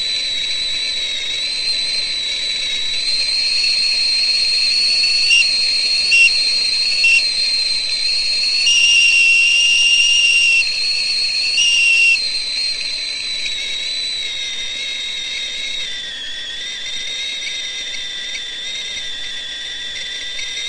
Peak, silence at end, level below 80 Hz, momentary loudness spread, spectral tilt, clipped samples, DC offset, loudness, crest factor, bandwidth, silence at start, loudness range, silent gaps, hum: -2 dBFS; 0 s; -48 dBFS; 13 LU; 2.5 dB/octave; under 0.1%; under 0.1%; -14 LUFS; 14 dB; 11.5 kHz; 0 s; 12 LU; none; none